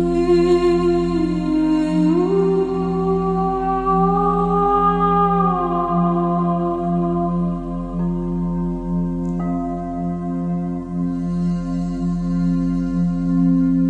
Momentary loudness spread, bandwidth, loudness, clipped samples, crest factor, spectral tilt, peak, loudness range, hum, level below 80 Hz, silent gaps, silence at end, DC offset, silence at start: 8 LU; 8 kHz; -19 LUFS; under 0.1%; 14 dB; -9 dB/octave; -4 dBFS; 6 LU; none; -34 dBFS; none; 0 s; under 0.1%; 0 s